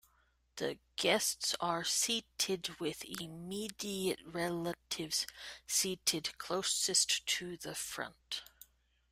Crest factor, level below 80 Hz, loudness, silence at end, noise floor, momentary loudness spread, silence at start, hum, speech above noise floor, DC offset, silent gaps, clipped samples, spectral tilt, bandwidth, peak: 20 dB; -70 dBFS; -35 LUFS; 0.65 s; -73 dBFS; 12 LU; 0.55 s; none; 36 dB; under 0.1%; none; under 0.1%; -1.5 dB/octave; 16 kHz; -18 dBFS